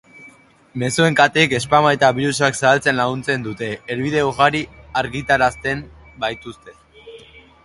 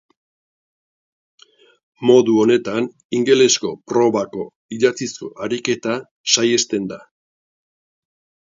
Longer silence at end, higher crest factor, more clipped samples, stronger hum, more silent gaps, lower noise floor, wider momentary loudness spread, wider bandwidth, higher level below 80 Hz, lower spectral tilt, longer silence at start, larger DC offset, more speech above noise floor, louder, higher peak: second, 0.25 s vs 1.5 s; about the same, 20 dB vs 20 dB; neither; neither; second, none vs 3.05-3.10 s, 4.56-4.69 s, 6.11-6.24 s; second, -47 dBFS vs under -90 dBFS; about the same, 12 LU vs 14 LU; first, 11.5 kHz vs 7.6 kHz; first, -48 dBFS vs -66 dBFS; about the same, -4.5 dB/octave vs -3.5 dB/octave; second, 0.2 s vs 2 s; neither; second, 29 dB vs over 73 dB; about the same, -18 LUFS vs -18 LUFS; about the same, 0 dBFS vs 0 dBFS